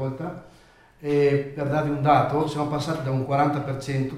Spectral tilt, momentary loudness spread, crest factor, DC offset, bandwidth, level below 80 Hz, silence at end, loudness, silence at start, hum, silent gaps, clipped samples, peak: -7.5 dB/octave; 13 LU; 20 dB; under 0.1%; 13 kHz; -54 dBFS; 0 s; -24 LUFS; 0 s; none; none; under 0.1%; -4 dBFS